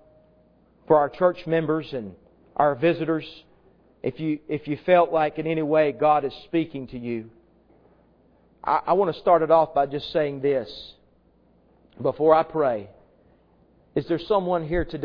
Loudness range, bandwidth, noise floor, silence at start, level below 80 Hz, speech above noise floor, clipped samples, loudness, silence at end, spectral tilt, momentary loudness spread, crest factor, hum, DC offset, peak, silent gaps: 3 LU; 5.4 kHz; -60 dBFS; 0.9 s; -50 dBFS; 37 dB; under 0.1%; -23 LUFS; 0 s; -9 dB/octave; 14 LU; 22 dB; none; under 0.1%; -2 dBFS; none